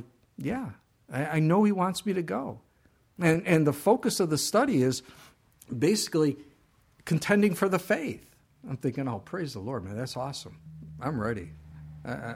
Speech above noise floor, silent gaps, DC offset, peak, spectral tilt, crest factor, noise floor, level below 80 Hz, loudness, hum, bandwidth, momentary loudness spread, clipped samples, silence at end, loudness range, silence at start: 37 dB; none; under 0.1%; -8 dBFS; -5.5 dB/octave; 20 dB; -65 dBFS; -60 dBFS; -28 LUFS; none; 16.5 kHz; 19 LU; under 0.1%; 0 s; 8 LU; 0 s